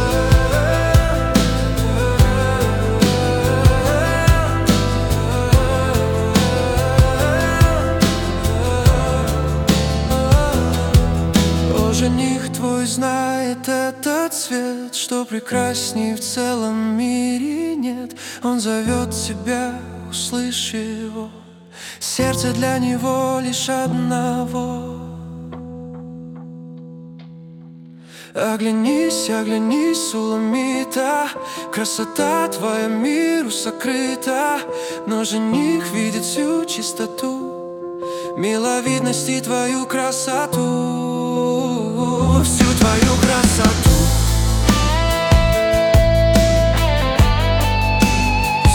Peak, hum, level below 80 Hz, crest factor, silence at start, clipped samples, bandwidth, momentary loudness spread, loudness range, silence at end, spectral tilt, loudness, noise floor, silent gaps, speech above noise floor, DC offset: 0 dBFS; none; -24 dBFS; 16 dB; 0 s; under 0.1%; 18 kHz; 12 LU; 7 LU; 0 s; -5 dB/octave; -18 LUFS; -39 dBFS; none; 20 dB; under 0.1%